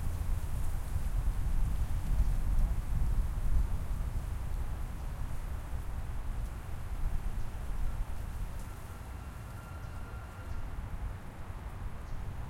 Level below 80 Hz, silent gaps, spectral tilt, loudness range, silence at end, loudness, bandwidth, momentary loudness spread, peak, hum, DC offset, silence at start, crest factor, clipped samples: -34 dBFS; none; -6.5 dB/octave; 8 LU; 0 s; -39 LUFS; 15.5 kHz; 10 LU; -16 dBFS; none; under 0.1%; 0 s; 16 dB; under 0.1%